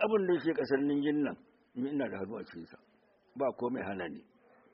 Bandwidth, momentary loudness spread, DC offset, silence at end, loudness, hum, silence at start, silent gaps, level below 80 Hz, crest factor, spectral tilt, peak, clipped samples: 5.6 kHz; 20 LU; under 0.1%; 0.55 s; -34 LUFS; none; 0 s; none; -76 dBFS; 18 dB; -5.5 dB/octave; -16 dBFS; under 0.1%